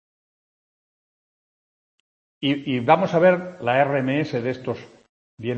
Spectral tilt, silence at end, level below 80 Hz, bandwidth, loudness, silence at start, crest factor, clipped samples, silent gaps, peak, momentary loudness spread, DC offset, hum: -7.5 dB/octave; 0 s; -68 dBFS; 7.4 kHz; -21 LUFS; 2.4 s; 22 dB; under 0.1%; 5.09-5.38 s; -2 dBFS; 13 LU; under 0.1%; none